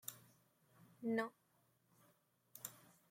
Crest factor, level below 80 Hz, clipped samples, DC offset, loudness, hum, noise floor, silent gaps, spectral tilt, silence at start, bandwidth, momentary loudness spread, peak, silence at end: 22 dB; under -90 dBFS; under 0.1%; under 0.1%; -46 LUFS; none; -78 dBFS; none; -4 dB/octave; 0.05 s; 16.5 kHz; 21 LU; -28 dBFS; 0.35 s